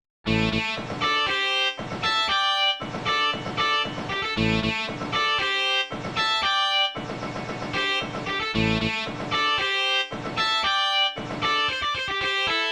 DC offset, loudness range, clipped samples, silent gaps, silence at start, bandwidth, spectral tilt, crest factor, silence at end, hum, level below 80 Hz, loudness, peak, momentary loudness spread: under 0.1%; 2 LU; under 0.1%; none; 0.25 s; 19.5 kHz; -3.5 dB/octave; 16 dB; 0 s; none; -48 dBFS; -23 LUFS; -10 dBFS; 6 LU